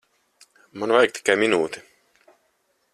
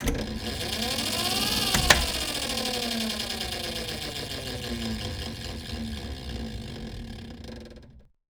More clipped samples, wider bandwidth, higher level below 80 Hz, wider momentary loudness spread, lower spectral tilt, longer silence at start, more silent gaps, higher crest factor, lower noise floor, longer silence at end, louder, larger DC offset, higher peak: neither; second, 13.5 kHz vs over 20 kHz; second, -68 dBFS vs -40 dBFS; about the same, 18 LU vs 17 LU; about the same, -3.5 dB/octave vs -2.5 dB/octave; first, 0.75 s vs 0 s; neither; second, 22 dB vs 30 dB; first, -69 dBFS vs -50 dBFS; first, 1.15 s vs 0.25 s; first, -21 LUFS vs -28 LUFS; neither; about the same, -2 dBFS vs 0 dBFS